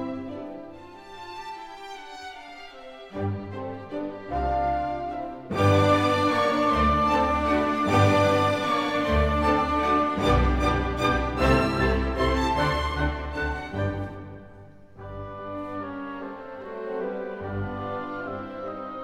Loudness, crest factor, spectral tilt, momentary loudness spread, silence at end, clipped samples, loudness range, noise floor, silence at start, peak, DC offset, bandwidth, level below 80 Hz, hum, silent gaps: -25 LUFS; 16 dB; -6.5 dB/octave; 18 LU; 0 s; under 0.1%; 14 LU; -47 dBFS; 0 s; -8 dBFS; under 0.1%; 15.5 kHz; -36 dBFS; none; none